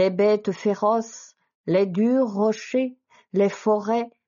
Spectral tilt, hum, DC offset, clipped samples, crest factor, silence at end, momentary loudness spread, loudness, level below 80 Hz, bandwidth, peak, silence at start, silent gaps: -6 dB/octave; none; under 0.1%; under 0.1%; 14 dB; 0.2 s; 9 LU; -23 LUFS; -76 dBFS; 7.2 kHz; -8 dBFS; 0 s; 1.55-1.64 s